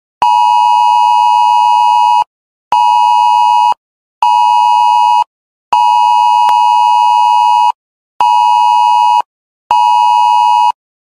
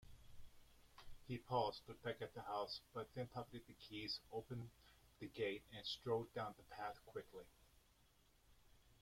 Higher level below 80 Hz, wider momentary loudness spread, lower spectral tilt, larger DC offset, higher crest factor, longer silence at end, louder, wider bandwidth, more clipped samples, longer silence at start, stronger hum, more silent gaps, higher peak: first, -62 dBFS vs -70 dBFS; second, 6 LU vs 19 LU; second, 1.5 dB/octave vs -5.5 dB/octave; neither; second, 10 dB vs 22 dB; first, 0.35 s vs 0.1 s; first, -9 LUFS vs -49 LUFS; second, 13 kHz vs 16.5 kHz; neither; first, 0.2 s vs 0.05 s; neither; first, 2.27-2.71 s, 3.77-4.22 s, 5.27-5.72 s, 7.75-8.20 s, 9.25-9.70 s vs none; first, 0 dBFS vs -28 dBFS